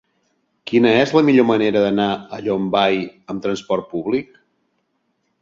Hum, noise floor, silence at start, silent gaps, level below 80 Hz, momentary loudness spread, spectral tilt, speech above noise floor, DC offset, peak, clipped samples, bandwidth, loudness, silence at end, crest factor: none; -69 dBFS; 0.65 s; none; -58 dBFS; 10 LU; -6.5 dB/octave; 52 dB; under 0.1%; -2 dBFS; under 0.1%; 7.6 kHz; -18 LUFS; 1.2 s; 16 dB